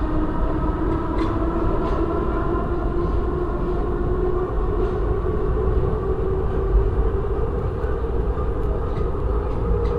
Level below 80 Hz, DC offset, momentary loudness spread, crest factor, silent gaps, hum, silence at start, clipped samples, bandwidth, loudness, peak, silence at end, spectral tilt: -24 dBFS; 0.4%; 3 LU; 14 dB; none; none; 0 s; under 0.1%; 5 kHz; -24 LUFS; -8 dBFS; 0 s; -10 dB/octave